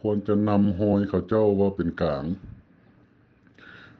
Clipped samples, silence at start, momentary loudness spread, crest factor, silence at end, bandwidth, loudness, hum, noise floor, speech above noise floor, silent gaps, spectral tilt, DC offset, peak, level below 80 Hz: under 0.1%; 0.05 s; 8 LU; 18 dB; 1.5 s; 4.8 kHz; -24 LUFS; none; -58 dBFS; 35 dB; none; -10.5 dB/octave; under 0.1%; -8 dBFS; -50 dBFS